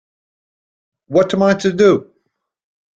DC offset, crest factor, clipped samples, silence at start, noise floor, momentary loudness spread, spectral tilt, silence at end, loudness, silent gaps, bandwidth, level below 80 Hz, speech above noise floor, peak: under 0.1%; 16 dB; under 0.1%; 1.1 s; -69 dBFS; 5 LU; -6 dB/octave; 0.95 s; -15 LUFS; none; 8 kHz; -56 dBFS; 56 dB; -2 dBFS